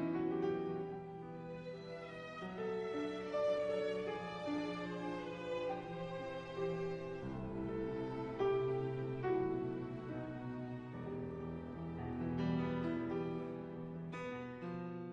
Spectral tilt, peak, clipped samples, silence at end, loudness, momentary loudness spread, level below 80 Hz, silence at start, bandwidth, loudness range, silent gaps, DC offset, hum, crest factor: -8 dB/octave; -26 dBFS; under 0.1%; 0 s; -42 LUFS; 9 LU; -66 dBFS; 0 s; 9.2 kHz; 3 LU; none; under 0.1%; none; 14 dB